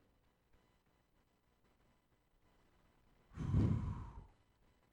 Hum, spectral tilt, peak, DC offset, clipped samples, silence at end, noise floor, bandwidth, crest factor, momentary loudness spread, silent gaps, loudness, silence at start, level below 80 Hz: 60 Hz at -70 dBFS; -9.5 dB/octave; -24 dBFS; under 0.1%; under 0.1%; 0.65 s; -77 dBFS; 7.8 kHz; 20 dB; 20 LU; none; -40 LUFS; 3.3 s; -54 dBFS